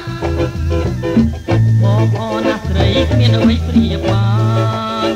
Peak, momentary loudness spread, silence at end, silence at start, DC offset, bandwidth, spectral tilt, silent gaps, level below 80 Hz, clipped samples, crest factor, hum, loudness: 0 dBFS; 6 LU; 0 s; 0 s; under 0.1%; 8.6 kHz; -7.5 dB/octave; none; -26 dBFS; under 0.1%; 12 dB; none; -14 LUFS